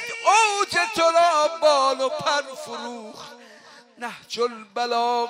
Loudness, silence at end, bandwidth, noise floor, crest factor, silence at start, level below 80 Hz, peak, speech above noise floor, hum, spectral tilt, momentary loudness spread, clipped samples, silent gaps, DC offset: -21 LUFS; 0 s; 16 kHz; -48 dBFS; 16 dB; 0 s; -70 dBFS; -6 dBFS; 25 dB; none; -1 dB/octave; 18 LU; under 0.1%; none; under 0.1%